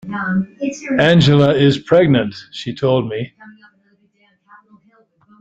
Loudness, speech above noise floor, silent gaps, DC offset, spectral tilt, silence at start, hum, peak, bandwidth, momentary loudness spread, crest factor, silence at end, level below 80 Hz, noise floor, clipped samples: -15 LUFS; 44 dB; none; under 0.1%; -7 dB/octave; 0.05 s; none; 0 dBFS; 8 kHz; 15 LU; 16 dB; 1.9 s; -50 dBFS; -59 dBFS; under 0.1%